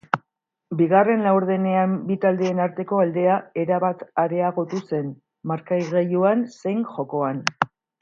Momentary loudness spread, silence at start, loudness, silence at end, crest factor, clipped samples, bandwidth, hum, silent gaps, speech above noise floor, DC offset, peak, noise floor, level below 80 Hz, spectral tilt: 9 LU; 0.15 s; -22 LUFS; 0.35 s; 22 dB; under 0.1%; 7.4 kHz; none; none; 56 dB; under 0.1%; 0 dBFS; -77 dBFS; -72 dBFS; -7 dB/octave